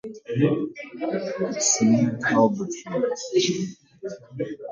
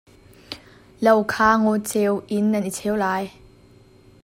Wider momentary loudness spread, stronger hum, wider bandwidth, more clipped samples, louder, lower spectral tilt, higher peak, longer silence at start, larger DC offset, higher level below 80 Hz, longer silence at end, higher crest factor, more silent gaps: second, 14 LU vs 20 LU; neither; second, 10 kHz vs 16.5 kHz; neither; second, -24 LUFS vs -20 LUFS; about the same, -4 dB/octave vs -5 dB/octave; second, -6 dBFS vs -2 dBFS; second, 0.05 s vs 0.5 s; neither; second, -66 dBFS vs -54 dBFS; second, 0 s vs 0.95 s; about the same, 18 dB vs 20 dB; neither